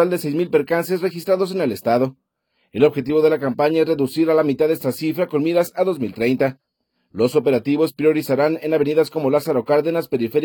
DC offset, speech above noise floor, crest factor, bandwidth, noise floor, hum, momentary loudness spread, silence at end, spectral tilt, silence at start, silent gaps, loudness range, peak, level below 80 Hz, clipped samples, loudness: under 0.1%; 51 dB; 16 dB; 19 kHz; -70 dBFS; none; 5 LU; 0 s; -6.5 dB/octave; 0 s; none; 2 LU; -4 dBFS; -64 dBFS; under 0.1%; -19 LUFS